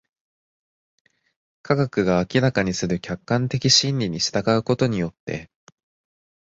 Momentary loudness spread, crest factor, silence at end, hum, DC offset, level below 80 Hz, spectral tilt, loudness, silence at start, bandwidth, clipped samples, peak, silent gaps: 11 LU; 20 dB; 1 s; none; under 0.1%; -50 dBFS; -4.5 dB/octave; -21 LUFS; 1.65 s; 8 kHz; under 0.1%; -4 dBFS; 5.20-5.27 s